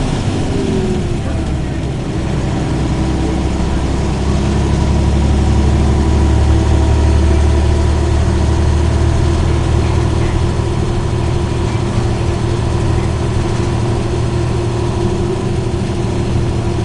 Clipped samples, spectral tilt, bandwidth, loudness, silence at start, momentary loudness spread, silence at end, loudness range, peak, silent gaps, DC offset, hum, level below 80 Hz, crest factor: under 0.1%; -7 dB/octave; 11 kHz; -15 LUFS; 0 s; 5 LU; 0 s; 4 LU; -2 dBFS; none; 1%; none; -18 dBFS; 12 dB